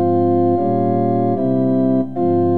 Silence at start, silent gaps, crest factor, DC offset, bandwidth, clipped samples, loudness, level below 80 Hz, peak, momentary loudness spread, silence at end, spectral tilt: 0 s; none; 10 dB; 2%; 4.4 kHz; under 0.1%; -17 LUFS; -60 dBFS; -6 dBFS; 2 LU; 0 s; -12 dB/octave